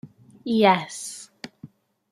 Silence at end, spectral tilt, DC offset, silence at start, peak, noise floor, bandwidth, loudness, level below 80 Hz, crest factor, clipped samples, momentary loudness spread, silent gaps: 0.45 s; -4.5 dB/octave; under 0.1%; 0.05 s; -4 dBFS; -48 dBFS; 13.5 kHz; -22 LUFS; -70 dBFS; 22 dB; under 0.1%; 23 LU; none